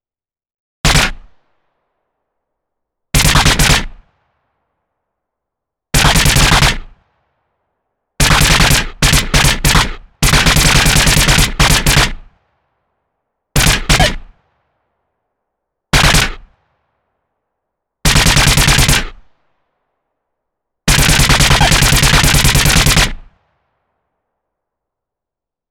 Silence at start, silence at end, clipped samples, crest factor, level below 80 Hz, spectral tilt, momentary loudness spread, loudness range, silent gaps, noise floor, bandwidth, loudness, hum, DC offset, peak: 0.85 s; 2.5 s; under 0.1%; 14 dB; -20 dBFS; -2.5 dB/octave; 8 LU; 7 LU; none; under -90 dBFS; 19 kHz; -10 LUFS; none; under 0.1%; 0 dBFS